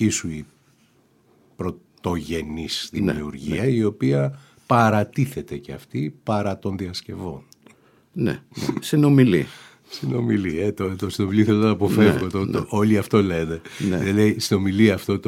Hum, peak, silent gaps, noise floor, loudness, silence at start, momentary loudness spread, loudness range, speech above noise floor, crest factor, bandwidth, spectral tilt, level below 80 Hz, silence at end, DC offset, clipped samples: none; -2 dBFS; none; -59 dBFS; -22 LUFS; 0 s; 14 LU; 8 LU; 38 dB; 18 dB; 16 kHz; -6.5 dB/octave; -50 dBFS; 0 s; under 0.1%; under 0.1%